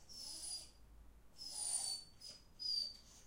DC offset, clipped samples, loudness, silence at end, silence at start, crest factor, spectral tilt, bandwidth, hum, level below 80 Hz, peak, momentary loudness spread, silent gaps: under 0.1%; under 0.1%; -43 LUFS; 0 s; 0 s; 18 dB; 1 dB/octave; 16 kHz; none; -68 dBFS; -30 dBFS; 16 LU; none